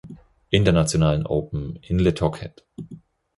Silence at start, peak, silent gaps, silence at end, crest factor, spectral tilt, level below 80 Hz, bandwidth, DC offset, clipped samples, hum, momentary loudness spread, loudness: 0.05 s; -4 dBFS; none; 0.4 s; 20 dB; -6 dB/octave; -38 dBFS; 11.5 kHz; under 0.1%; under 0.1%; none; 21 LU; -22 LUFS